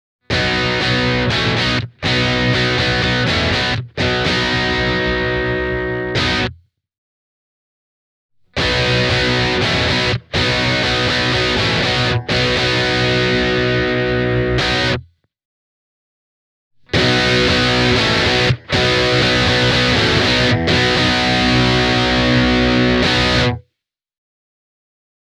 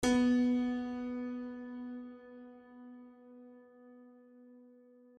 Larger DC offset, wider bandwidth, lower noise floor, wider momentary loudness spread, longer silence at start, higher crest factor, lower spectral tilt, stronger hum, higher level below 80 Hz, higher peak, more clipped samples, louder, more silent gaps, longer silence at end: neither; about the same, 12 kHz vs 11.5 kHz; first, -77 dBFS vs -61 dBFS; second, 5 LU vs 28 LU; first, 0.3 s vs 0 s; about the same, 16 dB vs 18 dB; about the same, -4.5 dB/octave vs -4.5 dB/octave; neither; first, -32 dBFS vs -64 dBFS; first, -2 dBFS vs -20 dBFS; neither; first, -15 LUFS vs -35 LUFS; first, 6.98-8.29 s, 15.45-16.71 s vs none; first, 1.7 s vs 0.55 s